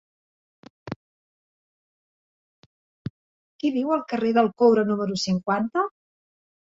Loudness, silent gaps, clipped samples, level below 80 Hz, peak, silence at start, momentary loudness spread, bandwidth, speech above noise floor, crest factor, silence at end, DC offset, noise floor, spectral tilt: -23 LUFS; 0.96-3.59 s; under 0.1%; -64 dBFS; -6 dBFS; 0.85 s; 20 LU; 7.8 kHz; over 68 dB; 20 dB; 0.75 s; under 0.1%; under -90 dBFS; -6 dB/octave